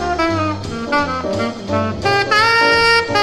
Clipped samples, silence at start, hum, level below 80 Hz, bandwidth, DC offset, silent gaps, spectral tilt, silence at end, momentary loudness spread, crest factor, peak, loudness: under 0.1%; 0 s; none; -40 dBFS; 13.5 kHz; under 0.1%; none; -4.5 dB/octave; 0 s; 10 LU; 16 dB; 0 dBFS; -15 LUFS